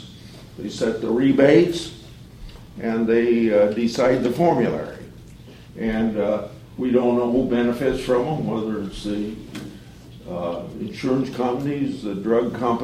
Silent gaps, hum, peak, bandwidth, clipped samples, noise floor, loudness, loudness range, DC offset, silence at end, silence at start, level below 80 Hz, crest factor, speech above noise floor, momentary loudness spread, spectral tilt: none; none; -2 dBFS; 15 kHz; under 0.1%; -42 dBFS; -21 LUFS; 7 LU; under 0.1%; 0 s; 0 s; -46 dBFS; 20 dB; 22 dB; 19 LU; -6.5 dB/octave